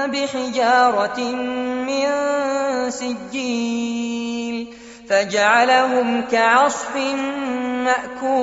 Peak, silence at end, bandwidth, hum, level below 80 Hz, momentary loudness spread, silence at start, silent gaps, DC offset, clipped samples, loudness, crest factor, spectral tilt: -2 dBFS; 0 s; 8 kHz; none; -60 dBFS; 10 LU; 0 s; none; under 0.1%; under 0.1%; -19 LUFS; 18 dB; -1 dB/octave